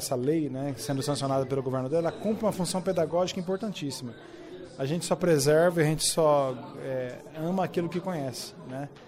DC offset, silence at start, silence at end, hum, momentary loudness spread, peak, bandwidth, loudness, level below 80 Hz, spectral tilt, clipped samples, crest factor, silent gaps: under 0.1%; 0 s; 0 s; none; 15 LU; -12 dBFS; 16 kHz; -28 LUFS; -60 dBFS; -5 dB/octave; under 0.1%; 16 dB; none